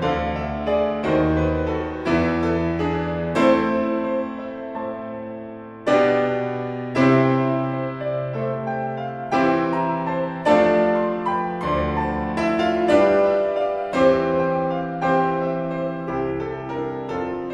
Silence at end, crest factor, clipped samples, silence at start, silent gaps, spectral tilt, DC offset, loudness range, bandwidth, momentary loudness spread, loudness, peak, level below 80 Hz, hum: 0 s; 18 dB; under 0.1%; 0 s; none; -7.5 dB/octave; under 0.1%; 4 LU; 10 kHz; 10 LU; -21 LUFS; -4 dBFS; -42 dBFS; none